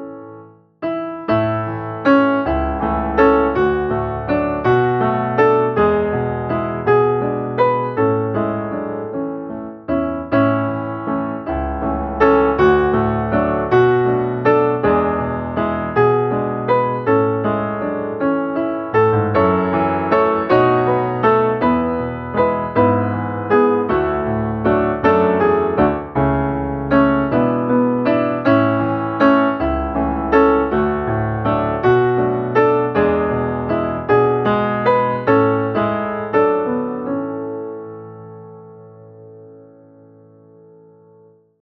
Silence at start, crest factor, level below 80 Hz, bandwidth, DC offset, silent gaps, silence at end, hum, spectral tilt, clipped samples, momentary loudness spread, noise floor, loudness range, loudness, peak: 0 s; 16 dB; -38 dBFS; 6.2 kHz; under 0.1%; none; 2 s; none; -9.5 dB/octave; under 0.1%; 8 LU; -50 dBFS; 4 LU; -17 LUFS; 0 dBFS